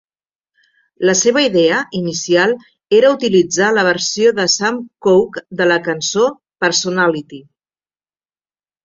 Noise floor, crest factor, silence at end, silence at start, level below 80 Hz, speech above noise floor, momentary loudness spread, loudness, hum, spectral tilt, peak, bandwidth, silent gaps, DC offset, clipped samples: under -90 dBFS; 14 dB; 1.45 s; 1 s; -60 dBFS; over 76 dB; 7 LU; -14 LUFS; none; -3 dB/octave; -2 dBFS; 7.6 kHz; none; under 0.1%; under 0.1%